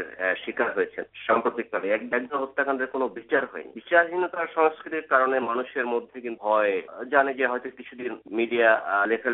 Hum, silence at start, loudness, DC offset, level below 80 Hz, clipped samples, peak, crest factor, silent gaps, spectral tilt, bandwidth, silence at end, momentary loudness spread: none; 0 s; -25 LUFS; under 0.1%; -72 dBFS; under 0.1%; -4 dBFS; 20 dB; none; -1.5 dB/octave; 4.1 kHz; 0 s; 11 LU